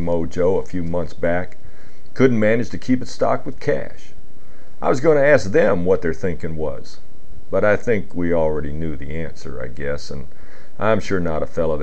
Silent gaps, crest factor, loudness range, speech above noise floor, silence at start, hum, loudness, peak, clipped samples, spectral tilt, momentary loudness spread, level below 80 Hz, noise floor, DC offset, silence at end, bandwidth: none; 20 dB; 5 LU; 25 dB; 0 s; none; -20 LUFS; 0 dBFS; under 0.1%; -7 dB/octave; 14 LU; -40 dBFS; -45 dBFS; 10%; 0 s; 9 kHz